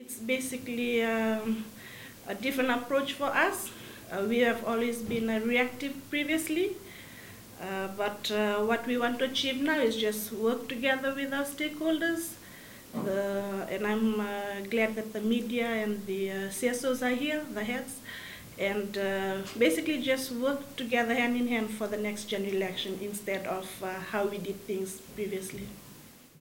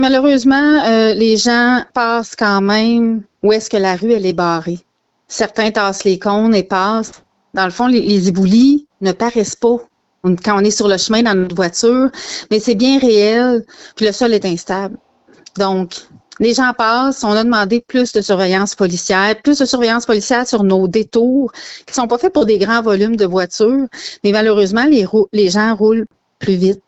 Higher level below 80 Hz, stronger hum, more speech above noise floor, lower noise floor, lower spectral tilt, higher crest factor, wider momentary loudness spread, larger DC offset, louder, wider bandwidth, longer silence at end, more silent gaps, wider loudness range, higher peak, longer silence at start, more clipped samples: second, -64 dBFS vs -50 dBFS; neither; second, 22 dB vs 32 dB; first, -52 dBFS vs -45 dBFS; about the same, -4 dB/octave vs -4.5 dB/octave; first, 20 dB vs 12 dB; first, 13 LU vs 9 LU; neither; second, -31 LUFS vs -14 LUFS; first, 17 kHz vs 8.2 kHz; about the same, 0 s vs 0.1 s; neither; about the same, 3 LU vs 3 LU; second, -12 dBFS vs -2 dBFS; about the same, 0 s vs 0 s; neither